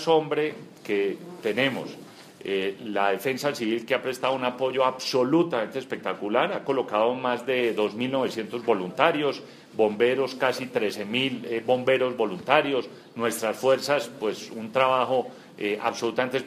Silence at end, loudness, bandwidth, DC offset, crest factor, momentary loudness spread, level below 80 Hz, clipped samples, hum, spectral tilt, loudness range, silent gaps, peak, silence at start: 0 s; -26 LUFS; 15.5 kHz; under 0.1%; 22 dB; 9 LU; -76 dBFS; under 0.1%; none; -4.5 dB/octave; 3 LU; none; -4 dBFS; 0 s